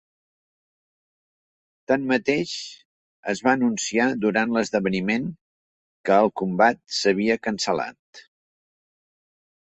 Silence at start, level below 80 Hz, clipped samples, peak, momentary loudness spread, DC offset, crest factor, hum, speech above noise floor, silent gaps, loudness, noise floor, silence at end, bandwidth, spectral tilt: 1.9 s; -64 dBFS; under 0.1%; -4 dBFS; 11 LU; under 0.1%; 20 dB; none; over 68 dB; 2.85-3.23 s, 5.41-6.04 s, 7.99-8.13 s; -22 LUFS; under -90 dBFS; 1.45 s; 8.4 kHz; -4.5 dB/octave